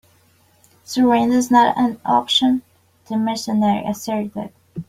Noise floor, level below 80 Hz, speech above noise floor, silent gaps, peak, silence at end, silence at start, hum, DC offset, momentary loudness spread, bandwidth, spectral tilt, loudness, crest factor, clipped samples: -56 dBFS; -58 dBFS; 39 dB; none; -2 dBFS; 0.05 s; 0.9 s; none; under 0.1%; 12 LU; 15.5 kHz; -4.5 dB/octave; -18 LUFS; 16 dB; under 0.1%